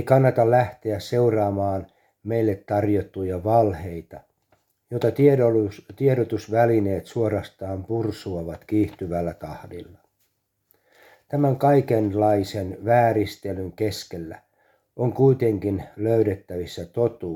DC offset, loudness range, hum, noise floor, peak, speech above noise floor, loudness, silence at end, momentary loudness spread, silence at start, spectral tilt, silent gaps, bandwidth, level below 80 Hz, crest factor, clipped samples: under 0.1%; 6 LU; none; -71 dBFS; -4 dBFS; 49 dB; -23 LUFS; 0 s; 14 LU; 0 s; -8 dB/octave; none; 17.5 kHz; -54 dBFS; 18 dB; under 0.1%